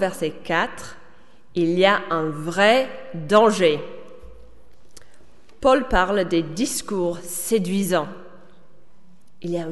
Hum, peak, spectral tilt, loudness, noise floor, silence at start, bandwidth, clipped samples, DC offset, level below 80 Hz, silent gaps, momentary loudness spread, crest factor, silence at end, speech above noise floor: none; -2 dBFS; -4.5 dB/octave; -21 LUFS; -55 dBFS; 0 s; 12 kHz; under 0.1%; 1%; -42 dBFS; none; 17 LU; 20 dB; 0 s; 35 dB